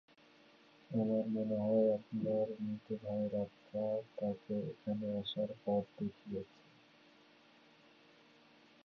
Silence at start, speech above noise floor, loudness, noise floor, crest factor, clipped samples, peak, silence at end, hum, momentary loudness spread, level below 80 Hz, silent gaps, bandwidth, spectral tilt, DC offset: 0.9 s; 28 dB; -38 LUFS; -65 dBFS; 18 dB; under 0.1%; -22 dBFS; 2.4 s; none; 9 LU; -76 dBFS; none; 6 kHz; -7 dB/octave; under 0.1%